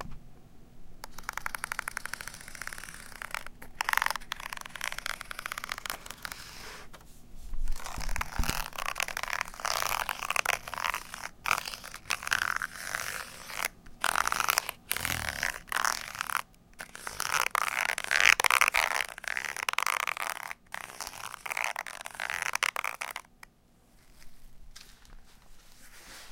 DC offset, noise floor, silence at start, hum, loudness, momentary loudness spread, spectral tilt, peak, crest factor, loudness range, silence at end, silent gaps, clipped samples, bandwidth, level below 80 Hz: under 0.1%; -62 dBFS; 0 s; none; -31 LUFS; 15 LU; -0.5 dB/octave; -2 dBFS; 32 dB; 12 LU; 0 s; none; under 0.1%; 17 kHz; -46 dBFS